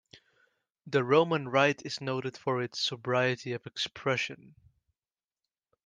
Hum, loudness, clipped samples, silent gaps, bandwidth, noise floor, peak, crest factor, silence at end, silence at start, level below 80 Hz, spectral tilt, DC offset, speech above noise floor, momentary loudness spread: none; -30 LUFS; under 0.1%; none; 9.8 kHz; under -90 dBFS; -10 dBFS; 22 dB; 1.5 s; 0.15 s; -74 dBFS; -5 dB/octave; under 0.1%; over 60 dB; 10 LU